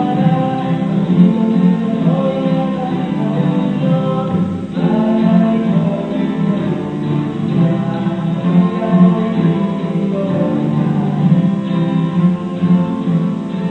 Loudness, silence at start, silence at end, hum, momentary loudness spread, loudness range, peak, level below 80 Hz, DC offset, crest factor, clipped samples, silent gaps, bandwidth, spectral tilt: -15 LUFS; 0 s; 0 s; none; 6 LU; 2 LU; 0 dBFS; -50 dBFS; 0.1%; 14 dB; under 0.1%; none; 4.3 kHz; -9.5 dB/octave